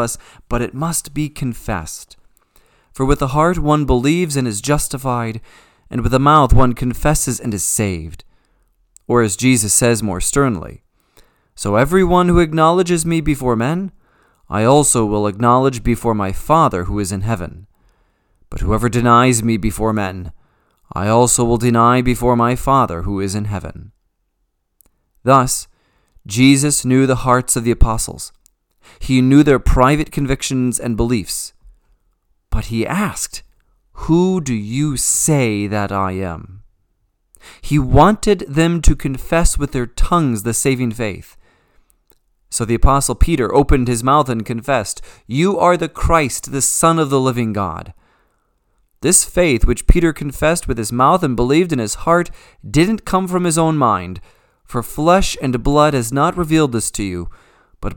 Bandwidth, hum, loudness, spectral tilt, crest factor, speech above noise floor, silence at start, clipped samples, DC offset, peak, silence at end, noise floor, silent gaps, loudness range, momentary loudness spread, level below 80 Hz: 19 kHz; none; -16 LUFS; -5 dB/octave; 16 dB; 53 dB; 0 s; under 0.1%; under 0.1%; 0 dBFS; 0 s; -68 dBFS; none; 4 LU; 13 LU; -26 dBFS